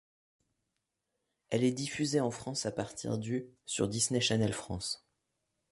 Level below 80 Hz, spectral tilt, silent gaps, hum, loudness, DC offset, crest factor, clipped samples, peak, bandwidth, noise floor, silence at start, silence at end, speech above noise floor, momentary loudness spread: -62 dBFS; -4 dB/octave; none; none; -33 LUFS; under 0.1%; 20 dB; under 0.1%; -16 dBFS; 12 kHz; -85 dBFS; 1.5 s; 0.75 s; 52 dB; 9 LU